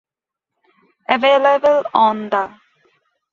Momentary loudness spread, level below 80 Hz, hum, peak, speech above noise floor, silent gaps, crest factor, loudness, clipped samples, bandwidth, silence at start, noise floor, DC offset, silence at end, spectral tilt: 11 LU; -64 dBFS; none; 0 dBFS; 69 dB; none; 18 dB; -15 LUFS; under 0.1%; 7.2 kHz; 1.1 s; -84 dBFS; under 0.1%; 0.85 s; -5 dB/octave